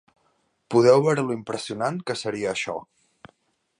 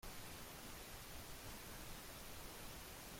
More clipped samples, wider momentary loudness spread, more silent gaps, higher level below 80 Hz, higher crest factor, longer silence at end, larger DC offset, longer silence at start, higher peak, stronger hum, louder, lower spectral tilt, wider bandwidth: neither; first, 13 LU vs 1 LU; neither; second, -66 dBFS vs -60 dBFS; first, 20 dB vs 14 dB; first, 0.95 s vs 0 s; neither; first, 0.7 s vs 0 s; first, -4 dBFS vs -40 dBFS; neither; first, -23 LUFS vs -53 LUFS; first, -5.5 dB/octave vs -3 dB/octave; second, 11 kHz vs 16.5 kHz